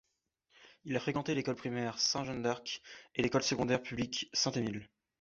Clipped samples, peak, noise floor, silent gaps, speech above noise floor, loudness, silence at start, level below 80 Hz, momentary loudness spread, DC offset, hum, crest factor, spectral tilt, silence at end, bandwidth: under 0.1%; -16 dBFS; -80 dBFS; none; 45 dB; -35 LUFS; 0.6 s; -66 dBFS; 9 LU; under 0.1%; none; 20 dB; -3.5 dB/octave; 0.35 s; 7.6 kHz